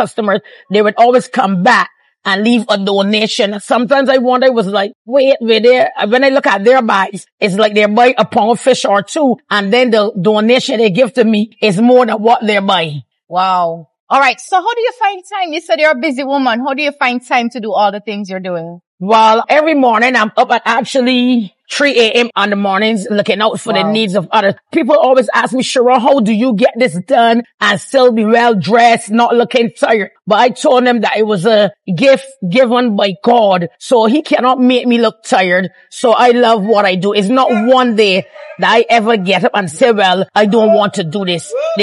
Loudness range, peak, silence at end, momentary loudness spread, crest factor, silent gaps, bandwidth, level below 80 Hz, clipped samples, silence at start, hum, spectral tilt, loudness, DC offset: 3 LU; 0 dBFS; 0 s; 7 LU; 10 dB; 4.95-5.05 s, 7.32-7.38 s, 14.00-14.07 s, 18.87-18.98 s, 27.54-27.58 s; 11.5 kHz; -74 dBFS; under 0.1%; 0 s; none; -5 dB/octave; -11 LUFS; under 0.1%